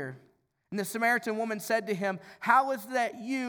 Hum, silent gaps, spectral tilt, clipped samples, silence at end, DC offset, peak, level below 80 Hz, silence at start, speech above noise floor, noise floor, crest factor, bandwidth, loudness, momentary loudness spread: none; none; -4.5 dB/octave; under 0.1%; 0 s; under 0.1%; -8 dBFS; -82 dBFS; 0 s; 38 dB; -67 dBFS; 22 dB; over 20 kHz; -29 LUFS; 10 LU